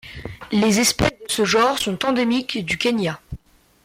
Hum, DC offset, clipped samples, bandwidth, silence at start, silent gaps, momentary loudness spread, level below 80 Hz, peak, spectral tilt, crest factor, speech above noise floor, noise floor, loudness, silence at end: none; under 0.1%; under 0.1%; 16.5 kHz; 0.05 s; none; 18 LU; -44 dBFS; -4 dBFS; -3.5 dB/octave; 18 dB; 25 dB; -44 dBFS; -20 LUFS; 0.5 s